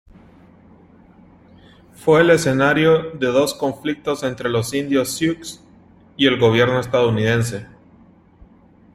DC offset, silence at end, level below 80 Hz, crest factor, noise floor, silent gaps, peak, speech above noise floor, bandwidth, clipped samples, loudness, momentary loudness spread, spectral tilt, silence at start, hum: under 0.1%; 1.3 s; -52 dBFS; 18 dB; -50 dBFS; none; -2 dBFS; 32 dB; 16 kHz; under 0.1%; -18 LUFS; 10 LU; -5 dB/octave; 2 s; none